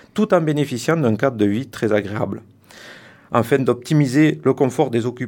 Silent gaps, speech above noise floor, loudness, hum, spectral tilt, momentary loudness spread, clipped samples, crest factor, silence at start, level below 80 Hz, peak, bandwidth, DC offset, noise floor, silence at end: none; 24 dB; -19 LUFS; none; -7 dB/octave; 8 LU; under 0.1%; 18 dB; 0.15 s; -62 dBFS; 0 dBFS; 18 kHz; under 0.1%; -43 dBFS; 0 s